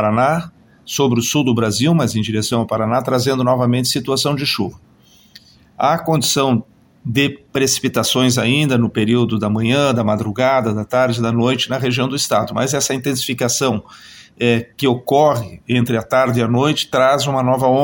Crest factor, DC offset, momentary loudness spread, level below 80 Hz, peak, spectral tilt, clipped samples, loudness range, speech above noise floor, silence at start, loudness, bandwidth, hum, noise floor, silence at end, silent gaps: 16 dB; under 0.1%; 5 LU; -52 dBFS; 0 dBFS; -4.5 dB/octave; under 0.1%; 3 LU; 30 dB; 0 s; -16 LUFS; 17 kHz; none; -46 dBFS; 0 s; none